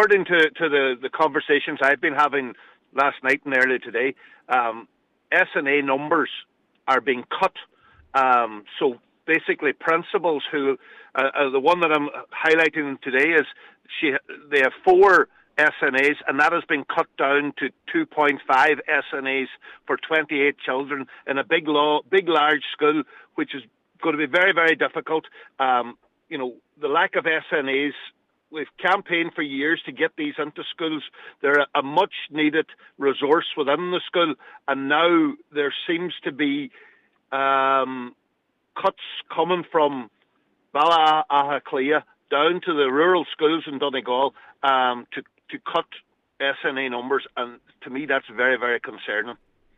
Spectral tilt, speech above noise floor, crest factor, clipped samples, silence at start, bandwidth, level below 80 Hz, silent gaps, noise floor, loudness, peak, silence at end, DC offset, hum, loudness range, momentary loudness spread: -5 dB/octave; 50 dB; 16 dB; under 0.1%; 0 s; 10 kHz; -70 dBFS; none; -72 dBFS; -22 LUFS; -6 dBFS; 0.45 s; under 0.1%; none; 5 LU; 12 LU